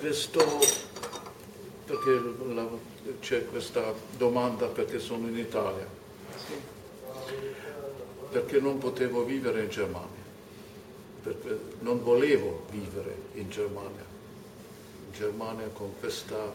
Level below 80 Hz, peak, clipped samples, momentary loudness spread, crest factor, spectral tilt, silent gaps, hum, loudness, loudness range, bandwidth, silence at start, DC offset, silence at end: -64 dBFS; -8 dBFS; under 0.1%; 21 LU; 24 dB; -3.5 dB/octave; none; none; -31 LUFS; 7 LU; 16.5 kHz; 0 s; under 0.1%; 0 s